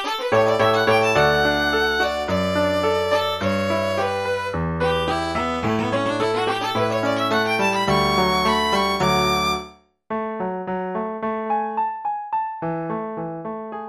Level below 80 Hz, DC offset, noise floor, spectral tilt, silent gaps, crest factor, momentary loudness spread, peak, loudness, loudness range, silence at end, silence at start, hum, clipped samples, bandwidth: -44 dBFS; under 0.1%; -42 dBFS; -4.5 dB/octave; none; 16 dB; 10 LU; -4 dBFS; -21 LUFS; 7 LU; 0 s; 0 s; none; under 0.1%; 13.5 kHz